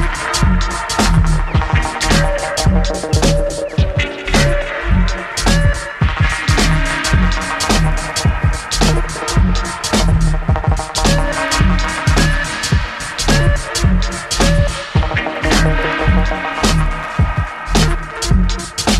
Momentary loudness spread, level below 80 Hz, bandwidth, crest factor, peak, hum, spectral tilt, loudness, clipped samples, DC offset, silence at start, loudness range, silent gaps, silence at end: 4 LU; -18 dBFS; 14 kHz; 14 dB; 0 dBFS; none; -4.5 dB/octave; -16 LUFS; under 0.1%; under 0.1%; 0 s; 1 LU; none; 0 s